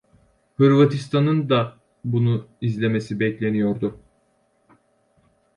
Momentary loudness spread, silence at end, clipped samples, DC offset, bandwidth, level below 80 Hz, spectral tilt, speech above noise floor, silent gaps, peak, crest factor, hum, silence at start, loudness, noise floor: 11 LU; 1.65 s; under 0.1%; under 0.1%; 10.5 kHz; -58 dBFS; -8 dB/octave; 45 dB; none; -4 dBFS; 18 dB; none; 0.6 s; -21 LUFS; -65 dBFS